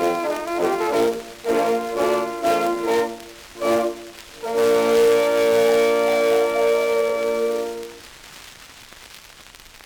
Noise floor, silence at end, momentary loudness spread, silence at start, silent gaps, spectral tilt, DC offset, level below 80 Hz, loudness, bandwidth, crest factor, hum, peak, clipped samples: -45 dBFS; 0.1 s; 23 LU; 0 s; none; -3.5 dB/octave; under 0.1%; -56 dBFS; -20 LUFS; over 20 kHz; 16 dB; none; -4 dBFS; under 0.1%